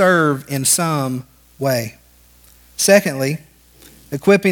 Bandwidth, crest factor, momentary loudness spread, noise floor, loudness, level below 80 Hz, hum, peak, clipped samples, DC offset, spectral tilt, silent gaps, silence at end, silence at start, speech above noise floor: 19.5 kHz; 18 dB; 16 LU; -49 dBFS; -17 LUFS; -54 dBFS; 60 Hz at -50 dBFS; 0 dBFS; under 0.1%; under 0.1%; -4 dB/octave; none; 0 s; 0 s; 33 dB